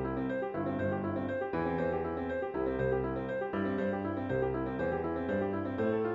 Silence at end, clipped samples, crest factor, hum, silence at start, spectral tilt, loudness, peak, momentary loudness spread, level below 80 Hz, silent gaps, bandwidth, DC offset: 0 s; under 0.1%; 14 dB; none; 0 s; -9.5 dB/octave; -34 LUFS; -20 dBFS; 3 LU; -54 dBFS; none; 7.4 kHz; under 0.1%